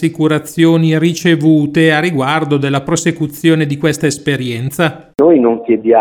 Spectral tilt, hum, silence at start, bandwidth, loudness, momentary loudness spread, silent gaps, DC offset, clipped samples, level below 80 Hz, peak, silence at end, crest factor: -6 dB/octave; none; 0 s; 16.5 kHz; -13 LUFS; 6 LU; none; under 0.1%; under 0.1%; -50 dBFS; 0 dBFS; 0 s; 12 dB